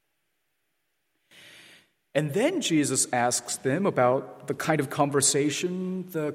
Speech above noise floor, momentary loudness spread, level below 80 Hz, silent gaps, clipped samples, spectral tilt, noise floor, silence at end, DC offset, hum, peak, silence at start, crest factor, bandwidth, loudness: 52 dB; 9 LU; -72 dBFS; none; under 0.1%; -4 dB/octave; -78 dBFS; 0 s; under 0.1%; none; -8 dBFS; 1.45 s; 20 dB; 16.5 kHz; -25 LUFS